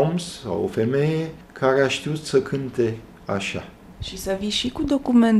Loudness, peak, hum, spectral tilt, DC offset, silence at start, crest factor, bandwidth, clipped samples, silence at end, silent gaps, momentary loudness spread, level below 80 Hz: -23 LUFS; -4 dBFS; none; -5.5 dB/octave; under 0.1%; 0 s; 18 dB; 13.5 kHz; under 0.1%; 0 s; none; 14 LU; -46 dBFS